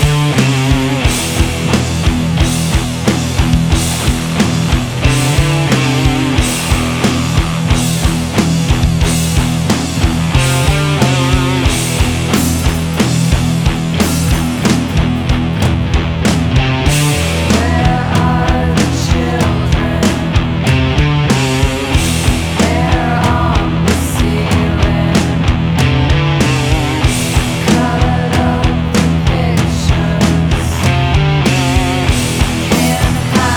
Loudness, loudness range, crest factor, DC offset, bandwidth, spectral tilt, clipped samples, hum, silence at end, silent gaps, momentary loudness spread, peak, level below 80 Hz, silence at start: -13 LUFS; 1 LU; 12 dB; under 0.1%; 19.5 kHz; -5 dB/octave; under 0.1%; none; 0 s; none; 2 LU; 0 dBFS; -20 dBFS; 0 s